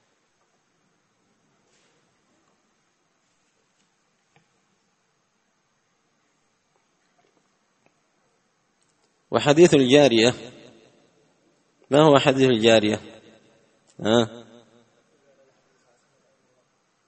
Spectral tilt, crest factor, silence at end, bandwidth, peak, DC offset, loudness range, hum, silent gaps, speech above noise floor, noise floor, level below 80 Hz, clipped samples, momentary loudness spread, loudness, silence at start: -5 dB/octave; 24 dB; 2.7 s; 8.4 kHz; 0 dBFS; under 0.1%; 11 LU; none; none; 52 dB; -70 dBFS; -64 dBFS; under 0.1%; 15 LU; -18 LUFS; 9.3 s